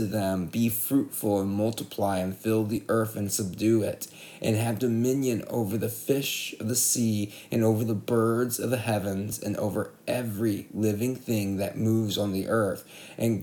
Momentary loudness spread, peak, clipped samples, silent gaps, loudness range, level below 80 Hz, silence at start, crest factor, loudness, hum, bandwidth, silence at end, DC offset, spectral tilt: 6 LU; -12 dBFS; under 0.1%; none; 2 LU; -66 dBFS; 0 s; 16 dB; -27 LUFS; none; 19.5 kHz; 0 s; under 0.1%; -5 dB/octave